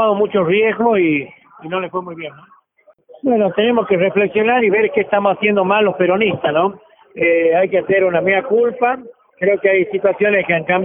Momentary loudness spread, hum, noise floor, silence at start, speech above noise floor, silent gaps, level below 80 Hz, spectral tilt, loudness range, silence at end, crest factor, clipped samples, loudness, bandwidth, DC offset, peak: 9 LU; none; -54 dBFS; 0 s; 39 dB; none; -58 dBFS; -11 dB/octave; 4 LU; 0 s; 14 dB; under 0.1%; -15 LUFS; 3.7 kHz; under 0.1%; 0 dBFS